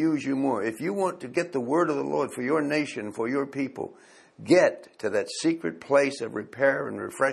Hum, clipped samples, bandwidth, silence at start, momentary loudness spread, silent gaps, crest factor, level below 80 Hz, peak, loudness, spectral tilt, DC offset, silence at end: none; under 0.1%; 13 kHz; 0 s; 10 LU; none; 18 dB; -72 dBFS; -8 dBFS; -26 LUFS; -5 dB/octave; under 0.1%; 0 s